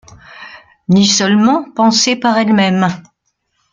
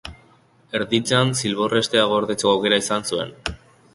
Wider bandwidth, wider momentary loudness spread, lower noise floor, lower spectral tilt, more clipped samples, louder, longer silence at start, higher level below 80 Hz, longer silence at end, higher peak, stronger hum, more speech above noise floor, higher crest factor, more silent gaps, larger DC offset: second, 9 kHz vs 12 kHz; first, 19 LU vs 11 LU; first, -66 dBFS vs -55 dBFS; about the same, -4 dB/octave vs -4 dB/octave; neither; first, -12 LUFS vs -20 LUFS; first, 0.3 s vs 0.05 s; second, -54 dBFS vs -48 dBFS; first, 0.7 s vs 0.4 s; about the same, 0 dBFS vs -2 dBFS; neither; first, 55 dB vs 35 dB; second, 14 dB vs 20 dB; neither; neither